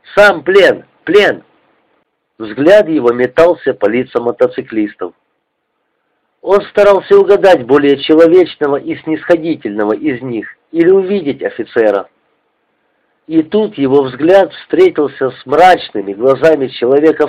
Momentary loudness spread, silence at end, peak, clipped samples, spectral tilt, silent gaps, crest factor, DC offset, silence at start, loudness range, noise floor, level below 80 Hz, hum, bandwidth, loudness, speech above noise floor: 11 LU; 0 s; 0 dBFS; under 0.1%; -6 dB/octave; none; 12 dB; under 0.1%; 0.1 s; 6 LU; -67 dBFS; -50 dBFS; none; 11 kHz; -11 LUFS; 56 dB